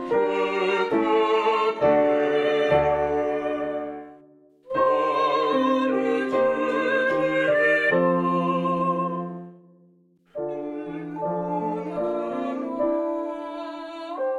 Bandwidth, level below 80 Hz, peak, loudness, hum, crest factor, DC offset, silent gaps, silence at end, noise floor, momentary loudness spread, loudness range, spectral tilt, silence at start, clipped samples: 10.5 kHz; -56 dBFS; -8 dBFS; -23 LUFS; none; 16 dB; under 0.1%; none; 0 s; -59 dBFS; 13 LU; 8 LU; -6.5 dB/octave; 0 s; under 0.1%